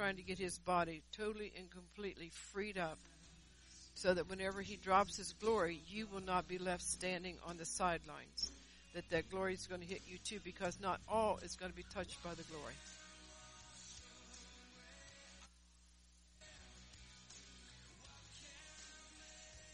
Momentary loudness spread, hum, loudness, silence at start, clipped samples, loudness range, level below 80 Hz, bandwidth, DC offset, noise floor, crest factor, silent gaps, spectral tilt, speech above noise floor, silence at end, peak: 21 LU; none; -43 LUFS; 0 s; under 0.1%; 19 LU; -64 dBFS; 11 kHz; under 0.1%; -67 dBFS; 24 dB; none; -3.5 dB/octave; 24 dB; 0 s; -20 dBFS